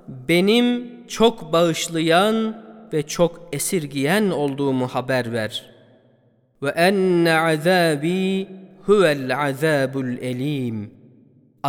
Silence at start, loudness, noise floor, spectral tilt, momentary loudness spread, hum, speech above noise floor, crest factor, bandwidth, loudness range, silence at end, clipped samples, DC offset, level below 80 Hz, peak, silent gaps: 0.1 s; -20 LUFS; -59 dBFS; -5 dB/octave; 11 LU; none; 40 dB; 18 dB; 18 kHz; 4 LU; 0 s; under 0.1%; under 0.1%; -56 dBFS; -4 dBFS; none